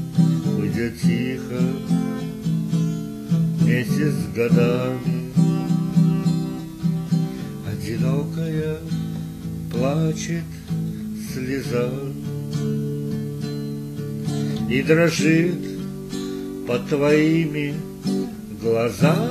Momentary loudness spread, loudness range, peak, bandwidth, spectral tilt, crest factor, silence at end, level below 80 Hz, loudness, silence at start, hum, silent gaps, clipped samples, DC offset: 11 LU; 6 LU; -4 dBFS; 14.5 kHz; -7 dB/octave; 18 dB; 0 s; -50 dBFS; -23 LUFS; 0 s; none; none; under 0.1%; under 0.1%